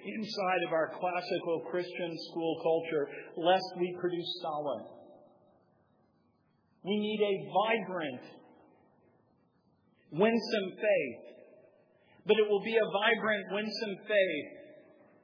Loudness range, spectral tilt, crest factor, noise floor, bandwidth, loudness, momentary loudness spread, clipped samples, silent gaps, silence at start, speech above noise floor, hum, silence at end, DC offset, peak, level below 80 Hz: 5 LU; -6 dB/octave; 20 dB; -71 dBFS; 5.4 kHz; -32 LUFS; 11 LU; under 0.1%; none; 0 s; 40 dB; none; 0.4 s; under 0.1%; -14 dBFS; under -90 dBFS